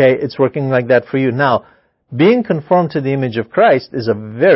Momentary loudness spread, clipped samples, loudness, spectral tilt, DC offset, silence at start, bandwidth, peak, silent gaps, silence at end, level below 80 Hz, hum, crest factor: 7 LU; under 0.1%; -15 LUFS; -11 dB/octave; under 0.1%; 0 s; 5.8 kHz; 0 dBFS; none; 0 s; -56 dBFS; none; 14 dB